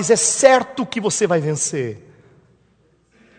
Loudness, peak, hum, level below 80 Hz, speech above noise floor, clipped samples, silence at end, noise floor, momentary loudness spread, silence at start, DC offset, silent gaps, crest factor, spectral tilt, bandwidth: -17 LUFS; 0 dBFS; none; -62 dBFS; 41 dB; under 0.1%; 1.4 s; -59 dBFS; 14 LU; 0 s; under 0.1%; none; 20 dB; -3.5 dB/octave; 9.4 kHz